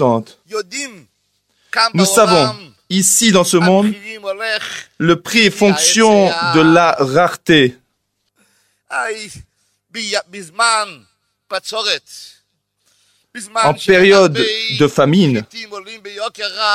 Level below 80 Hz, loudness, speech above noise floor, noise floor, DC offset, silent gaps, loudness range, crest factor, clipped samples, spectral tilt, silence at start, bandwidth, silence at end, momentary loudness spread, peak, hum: -54 dBFS; -13 LUFS; 55 dB; -69 dBFS; under 0.1%; none; 9 LU; 16 dB; under 0.1%; -3.5 dB/octave; 0 s; 16 kHz; 0 s; 17 LU; 0 dBFS; 50 Hz at -45 dBFS